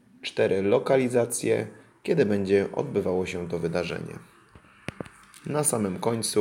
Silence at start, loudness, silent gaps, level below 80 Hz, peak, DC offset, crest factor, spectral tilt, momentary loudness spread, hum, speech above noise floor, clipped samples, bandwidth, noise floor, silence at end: 0.25 s; -26 LUFS; none; -62 dBFS; -8 dBFS; under 0.1%; 18 dB; -5 dB/octave; 18 LU; none; 29 dB; under 0.1%; 17 kHz; -54 dBFS; 0 s